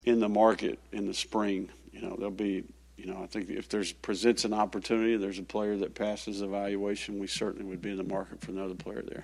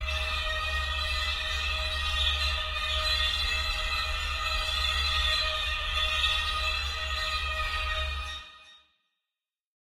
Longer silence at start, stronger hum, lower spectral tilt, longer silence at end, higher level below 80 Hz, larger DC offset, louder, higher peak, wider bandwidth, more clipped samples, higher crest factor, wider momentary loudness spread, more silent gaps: about the same, 0.05 s vs 0 s; neither; first, -4.5 dB/octave vs -1.5 dB/octave; second, 0 s vs 1.2 s; second, -58 dBFS vs -36 dBFS; neither; second, -32 LUFS vs -28 LUFS; first, -10 dBFS vs -14 dBFS; second, 12.5 kHz vs 16 kHz; neither; first, 22 dB vs 16 dB; first, 13 LU vs 5 LU; neither